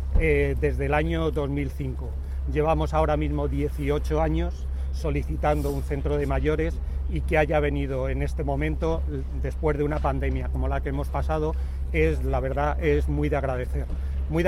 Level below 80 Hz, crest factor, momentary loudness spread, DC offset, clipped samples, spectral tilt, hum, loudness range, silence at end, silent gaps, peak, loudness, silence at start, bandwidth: -28 dBFS; 16 dB; 7 LU; under 0.1%; under 0.1%; -8 dB/octave; none; 1 LU; 0 s; none; -8 dBFS; -26 LUFS; 0 s; 12 kHz